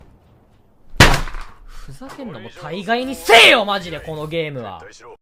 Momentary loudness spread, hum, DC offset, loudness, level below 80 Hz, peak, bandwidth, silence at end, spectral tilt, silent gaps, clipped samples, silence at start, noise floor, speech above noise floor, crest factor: 25 LU; none; under 0.1%; -13 LUFS; -30 dBFS; 0 dBFS; 16 kHz; 0.05 s; -3.5 dB/octave; none; under 0.1%; 0.9 s; -51 dBFS; 34 dB; 18 dB